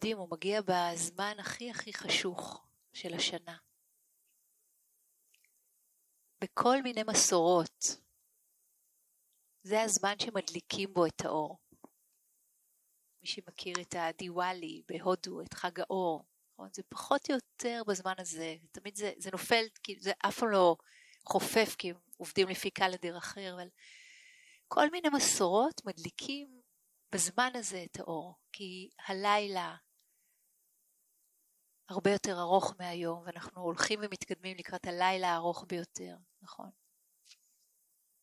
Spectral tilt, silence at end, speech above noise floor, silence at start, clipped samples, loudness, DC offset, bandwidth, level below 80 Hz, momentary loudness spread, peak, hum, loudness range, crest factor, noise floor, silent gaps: -2.5 dB/octave; 1.55 s; 40 dB; 0 s; under 0.1%; -34 LUFS; under 0.1%; 16 kHz; -76 dBFS; 16 LU; -10 dBFS; none; 7 LU; 26 dB; -74 dBFS; none